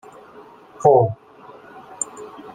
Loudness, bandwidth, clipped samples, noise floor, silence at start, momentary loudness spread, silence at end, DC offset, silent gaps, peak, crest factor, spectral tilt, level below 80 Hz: -19 LUFS; 9.6 kHz; under 0.1%; -45 dBFS; 0.8 s; 27 LU; 0 s; under 0.1%; none; -2 dBFS; 20 dB; -6.5 dB/octave; -64 dBFS